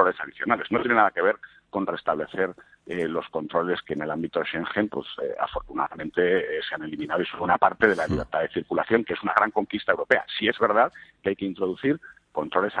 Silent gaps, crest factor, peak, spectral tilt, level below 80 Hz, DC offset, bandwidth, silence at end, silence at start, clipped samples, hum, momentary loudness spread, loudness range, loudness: none; 22 dB; -2 dBFS; -6.5 dB/octave; -54 dBFS; under 0.1%; 10 kHz; 0 s; 0 s; under 0.1%; none; 9 LU; 5 LU; -25 LUFS